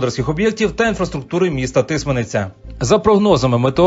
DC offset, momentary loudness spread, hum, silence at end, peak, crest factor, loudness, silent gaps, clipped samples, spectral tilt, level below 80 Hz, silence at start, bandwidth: under 0.1%; 9 LU; none; 0 s; -2 dBFS; 14 dB; -17 LUFS; none; under 0.1%; -6 dB/octave; -36 dBFS; 0 s; 7.8 kHz